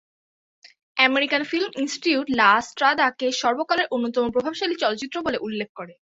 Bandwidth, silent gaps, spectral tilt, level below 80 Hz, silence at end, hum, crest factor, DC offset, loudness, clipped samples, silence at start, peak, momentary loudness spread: 8 kHz; 5.69-5.75 s; -3 dB/octave; -62 dBFS; 0.2 s; none; 20 dB; under 0.1%; -22 LUFS; under 0.1%; 0.95 s; -4 dBFS; 10 LU